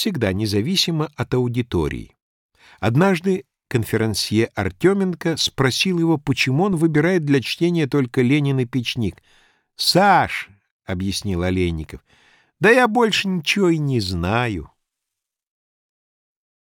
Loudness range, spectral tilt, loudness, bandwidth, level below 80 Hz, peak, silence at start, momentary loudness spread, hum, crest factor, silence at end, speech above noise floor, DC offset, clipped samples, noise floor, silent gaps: 3 LU; -5.5 dB/octave; -19 LUFS; 18 kHz; -46 dBFS; -2 dBFS; 0 s; 10 LU; none; 18 dB; 2.1 s; 64 dB; under 0.1%; under 0.1%; -83 dBFS; 2.22-2.49 s, 10.71-10.79 s